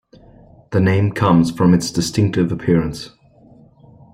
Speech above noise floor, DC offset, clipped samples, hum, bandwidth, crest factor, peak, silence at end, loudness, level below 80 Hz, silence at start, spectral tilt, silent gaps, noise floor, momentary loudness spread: 32 dB; under 0.1%; under 0.1%; none; 14.5 kHz; 16 dB; -2 dBFS; 1.05 s; -17 LUFS; -44 dBFS; 0.7 s; -6.5 dB/octave; none; -47 dBFS; 10 LU